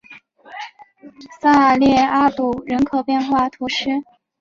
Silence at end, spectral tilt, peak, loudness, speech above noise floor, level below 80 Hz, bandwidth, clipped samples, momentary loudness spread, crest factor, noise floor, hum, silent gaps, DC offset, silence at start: 0.4 s; -5 dB/octave; -2 dBFS; -17 LUFS; 28 dB; -50 dBFS; 7.4 kHz; under 0.1%; 20 LU; 16 dB; -45 dBFS; none; none; under 0.1%; 0.1 s